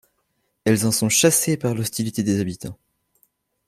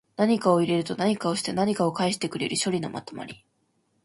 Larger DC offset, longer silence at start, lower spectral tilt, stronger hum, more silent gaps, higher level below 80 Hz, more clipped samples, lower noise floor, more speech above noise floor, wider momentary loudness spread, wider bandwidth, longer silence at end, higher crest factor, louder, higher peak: neither; first, 0.65 s vs 0.2 s; about the same, -4 dB/octave vs -5 dB/octave; neither; neither; first, -58 dBFS vs -66 dBFS; neither; about the same, -71 dBFS vs -70 dBFS; first, 51 dB vs 45 dB; about the same, 12 LU vs 14 LU; first, 16 kHz vs 11.5 kHz; first, 0.95 s vs 0.7 s; about the same, 20 dB vs 18 dB; first, -20 LUFS vs -25 LUFS; first, -2 dBFS vs -8 dBFS